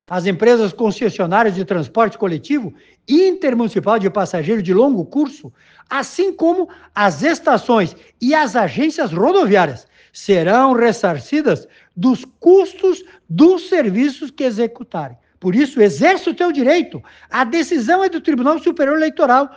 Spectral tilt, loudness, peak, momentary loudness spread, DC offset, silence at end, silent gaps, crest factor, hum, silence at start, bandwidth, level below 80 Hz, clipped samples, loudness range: -6 dB/octave; -16 LUFS; 0 dBFS; 10 LU; under 0.1%; 0.1 s; none; 16 dB; none; 0.1 s; 9.2 kHz; -60 dBFS; under 0.1%; 2 LU